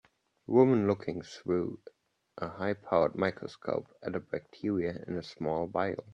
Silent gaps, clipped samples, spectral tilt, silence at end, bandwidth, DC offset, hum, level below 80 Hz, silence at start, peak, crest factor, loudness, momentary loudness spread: none; under 0.1%; -8 dB/octave; 0 s; 8 kHz; under 0.1%; none; -68 dBFS; 0.5 s; -12 dBFS; 20 dB; -32 LUFS; 15 LU